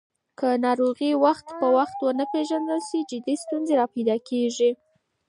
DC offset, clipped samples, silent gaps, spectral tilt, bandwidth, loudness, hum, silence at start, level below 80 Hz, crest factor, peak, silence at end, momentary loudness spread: under 0.1%; under 0.1%; none; -4.5 dB/octave; 11.5 kHz; -24 LUFS; none; 0.4 s; -76 dBFS; 18 dB; -6 dBFS; 0.55 s; 7 LU